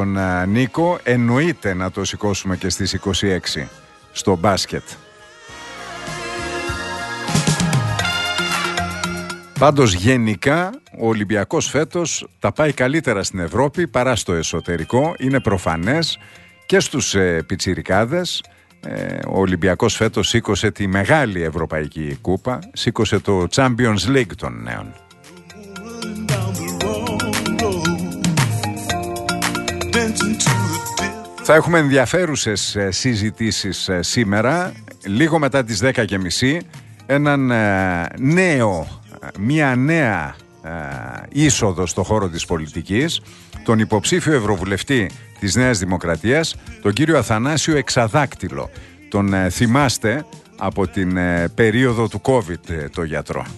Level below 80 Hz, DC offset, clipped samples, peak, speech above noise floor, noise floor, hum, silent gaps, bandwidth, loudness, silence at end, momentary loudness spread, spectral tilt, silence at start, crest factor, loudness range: -42 dBFS; under 0.1%; under 0.1%; 0 dBFS; 24 dB; -42 dBFS; none; none; 12.5 kHz; -19 LUFS; 0 s; 11 LU; -4.5 dB/octave; 0 s; 18 dB; 4 LU